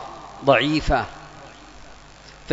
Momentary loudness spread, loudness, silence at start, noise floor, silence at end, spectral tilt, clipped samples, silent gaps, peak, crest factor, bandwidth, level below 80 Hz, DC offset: 25 LU; -21 LUFS; 0 s; -45 dBFS; 0 s; -5.5 dB/octave; under 0.1%; none; -2 dBFS; 22 dB; 8 kHz; -36 dBFS; under 0.1%